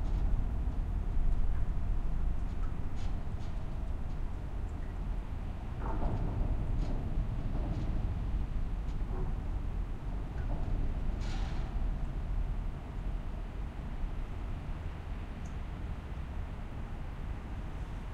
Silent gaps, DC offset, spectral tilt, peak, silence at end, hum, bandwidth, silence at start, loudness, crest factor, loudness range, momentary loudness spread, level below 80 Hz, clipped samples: none; under 0.1%; -8 dB/octave; -18 dBFS; 0 s; none; 7.2 kHz; 0 s; -39 LUFS; 14 dB; 5 LU; 6 LU; -34 dBFS; under 0.1%